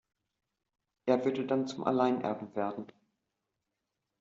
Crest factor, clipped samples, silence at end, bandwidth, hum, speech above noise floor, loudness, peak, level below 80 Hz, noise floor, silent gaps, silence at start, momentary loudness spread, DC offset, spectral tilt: 22 dB; under 0.1%; 1.35 s; 7.6 kHz; none; 55 dB; -32 LUFS; -14 dBFS; -76 dBFS; -86 dBFS; none; 1.05 s; 10 LU; under 0.1%; -5.5 dB/octave